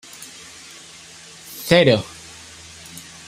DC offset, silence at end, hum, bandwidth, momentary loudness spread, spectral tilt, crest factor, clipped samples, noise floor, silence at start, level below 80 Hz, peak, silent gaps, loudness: under 0.1%; 0.25 s; none; 16 kHz; 24 LU; -4.5 dB/octave; 22 dB; under 0.1%; -42 dBFS; 0.2 s; -56 dBFS; -2 dBFS; none; -17 LUFS